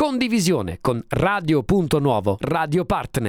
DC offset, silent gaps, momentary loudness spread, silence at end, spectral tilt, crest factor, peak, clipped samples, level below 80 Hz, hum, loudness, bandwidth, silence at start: under 0.1%; none; 4 LU; 0 s; -6 dB/octave; 16 dB; -4 dBFS; under 0.1%; -42 dBFS; none; -21 LUFS; 18 kHz; 0 s